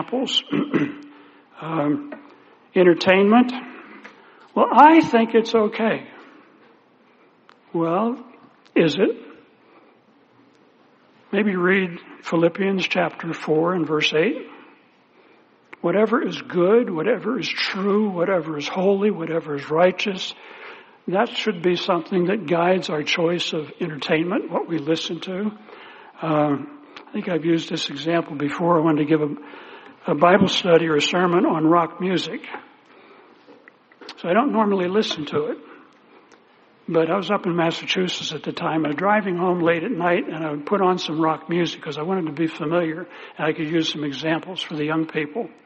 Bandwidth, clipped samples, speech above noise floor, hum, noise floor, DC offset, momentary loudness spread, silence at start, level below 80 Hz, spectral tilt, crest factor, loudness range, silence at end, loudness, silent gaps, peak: 8 kHz; under 0.1%; 35 dB; none; -55 dBFS; under 0.1%; 14 LU; 0 s; -68 dBFS; -4 dB/octave; 22 dB; 6 LU; 0.15 s; -21 LUFS; none; 0 dBFS